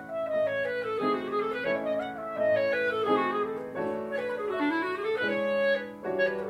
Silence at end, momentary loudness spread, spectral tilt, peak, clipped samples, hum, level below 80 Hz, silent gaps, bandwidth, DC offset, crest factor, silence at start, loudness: 0 s; 6 LU; -6 dB/octave; -14 dBFS; under 0.1%; none; -68 dBFS; none; 14 kHz; under 0.1%; 16 dB; 0 s; -29 LUFS